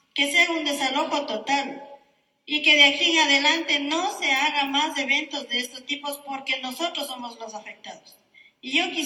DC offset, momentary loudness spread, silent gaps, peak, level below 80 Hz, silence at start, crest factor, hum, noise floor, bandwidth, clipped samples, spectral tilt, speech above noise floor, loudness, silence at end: under 0.1%; 19 LU; none; -4 dBFS; -78 dBFS; 0.15 s; 20 dB; none; -62 dBFS; 17.5 kHz; under 0.1%; 0 dB/octave; 38 dB; -21 LUFS; 0 s